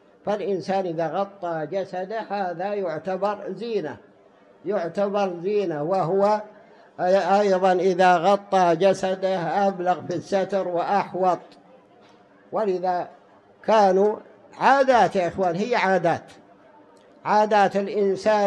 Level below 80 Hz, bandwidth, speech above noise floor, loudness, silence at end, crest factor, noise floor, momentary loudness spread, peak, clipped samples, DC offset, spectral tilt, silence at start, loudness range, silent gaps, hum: -68 dBFS; 10.5 kHz; 32 dB; -22 LUFS; 0 s; 18 dB; -54 dBFS; 11 LU; -4 dBFS; under 0.1%; under 0.1%; -6 dB/octave; 0.25 s; 7 LU; none; none